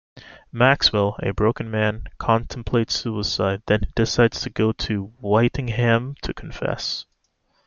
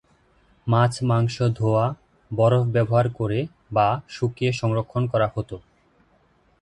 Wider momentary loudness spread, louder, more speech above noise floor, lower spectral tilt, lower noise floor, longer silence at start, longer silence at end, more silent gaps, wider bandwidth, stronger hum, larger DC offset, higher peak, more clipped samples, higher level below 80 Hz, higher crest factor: about the same, 9 LU vs 11 LU; about the same, -22 LUFS vs -23 LUFS; first, 46 dB vs 40 dB; second, -5.5 dB/octave vs -7.5 dB/octave; first, -67 dBFS vs -61 dBFS; second, 0.15 s vs 0.65 s; second, 0.65 s vs 1 s; neither; second, 7.2 kHz vs 10.5 kHz; neither; neither; about the same, -2 dBFS vs -4 dBFS; neither; first, -38 dBFS vs -52 dBFS; about the same, 20 dB vs 18 dB